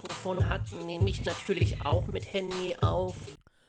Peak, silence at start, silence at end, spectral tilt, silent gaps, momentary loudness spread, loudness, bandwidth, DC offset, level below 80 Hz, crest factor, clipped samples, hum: -12 dBFS; 0 s; 0.3 s; -6 dB/octave; none; 7 LU; -31 LUFS; 9.2 kHz; under 0.1%; -42 dBFS; 18 dB; under 0.1%; none